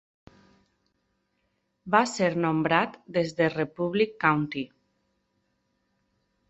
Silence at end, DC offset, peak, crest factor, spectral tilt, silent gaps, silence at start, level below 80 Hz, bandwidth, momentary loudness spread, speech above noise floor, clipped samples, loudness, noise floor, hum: 1.85 s; under 0.1%; -6 dBFS; 24 dB; -5.5 dB/octave; none; 1.85 s; -66 dBFS; 8.4 kHz; 6 LU; 50 dB; under 0.1%; -26 LUFS; -75 dBFS; none